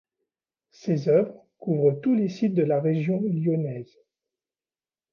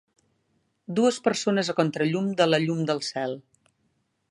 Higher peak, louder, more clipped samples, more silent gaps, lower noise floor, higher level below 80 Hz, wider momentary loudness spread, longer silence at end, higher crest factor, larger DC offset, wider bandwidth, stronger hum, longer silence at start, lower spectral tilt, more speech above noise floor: about the same, -10 dBFS vs -8 dBFS; about the same, -24 LUFS vs -25 LUFS; neither; neither; first, under -90 dBFS vs -72 dBFS; about the same, -72 dBFS vs -72 dBFS; about the same, 11 LU vs 9 LU; first, 1.3 s vs 0.9 s; about the same, 16 dB vs 20 dB; neither; second, 6.8 kHz vs 11.5 kHz; neither; about the same, 0.85 s vs 0.9 s; first, -9.5 dB/octave vs -5 dB/octave; first, over 66 dB vs 48 dB